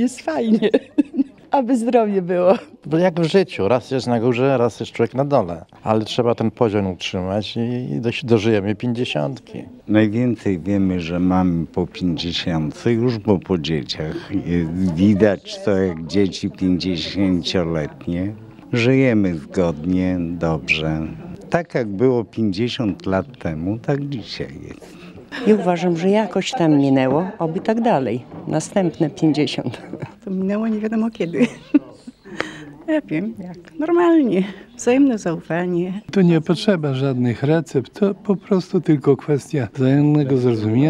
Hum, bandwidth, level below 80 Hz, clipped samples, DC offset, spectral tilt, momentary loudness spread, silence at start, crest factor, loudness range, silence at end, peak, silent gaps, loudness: none; 11 kHz; -48 dBFS; under 0.1%; under 0.1%; -7 dB/octave; 10 LU; 0 s; 18 dB; 3 LU; 0 s; 0 dBFS; none; -19 LUFS